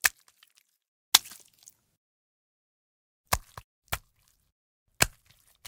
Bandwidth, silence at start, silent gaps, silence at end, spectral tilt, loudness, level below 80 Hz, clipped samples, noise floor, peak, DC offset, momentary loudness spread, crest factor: 18 kHz; 0.05 s; 0.88-1.12 s, 1.97-3.24 s, 3.64-3.82 s, 4.52-4.86 s; 0.6 s; 0 dB/octave; -27 LUFS; -52 dBFS; under 0.1%; -69 dBFS; 0 dBFS; under 0.1%; 16 LU; 34 dB